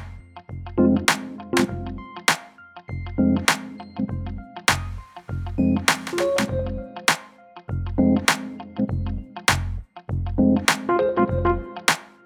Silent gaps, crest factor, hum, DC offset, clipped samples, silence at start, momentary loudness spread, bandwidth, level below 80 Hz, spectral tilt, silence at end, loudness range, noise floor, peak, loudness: none; 22 dB; none; under 0.1%; under 0.1%; 0 s; 15 LU; 19 kHz; -38 dBFS; -4.5 dB/octave; 0.2 s; 2 LU; -45 dBFS; -2 dBFS; -23 LUFS